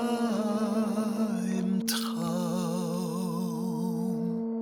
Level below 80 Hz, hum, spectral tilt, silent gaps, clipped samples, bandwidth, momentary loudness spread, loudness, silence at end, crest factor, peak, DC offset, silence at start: -70 dBFS; none; -5.5 dB/octave; none; under 0.1%; 19.5 kHz; 3 LU; -30 LUFS; 0 s; 14 dB; -16 dBFS; under 0.1%; 0 s